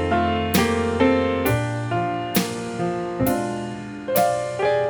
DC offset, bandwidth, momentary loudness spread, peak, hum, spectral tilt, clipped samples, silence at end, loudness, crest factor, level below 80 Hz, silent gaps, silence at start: under 0.1%; over 20 kHz; 8 LU; -4 dBFS; none; -5.5 dB/octave; under 0.1%; 0 s; -22 LUFS; 18 dB; -44 dBFS; none; 0 s